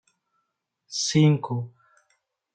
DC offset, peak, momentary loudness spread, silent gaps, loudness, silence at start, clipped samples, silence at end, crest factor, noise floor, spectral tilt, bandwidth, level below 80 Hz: under 0.1%; -10 dBFS; 14 LU; none; -23 LUFS; 0.9 s; under 0.1%; 0.85 s; 18 dB; -78 dBFS; -5.5 dB/octave; 9.2 kHz; -66 dBFS